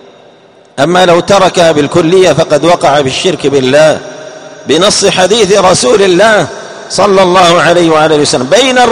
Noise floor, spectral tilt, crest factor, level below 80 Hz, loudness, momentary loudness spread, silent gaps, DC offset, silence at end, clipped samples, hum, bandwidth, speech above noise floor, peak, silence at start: -39 dBFS; -4 dB/octave; 6 dB; -42 dBFS; -6 LUFS; 10 LU; none; 0.4%; 0 s; 3%; none; 15 kHz; 33 dB; 0 dBFS; 0.75 s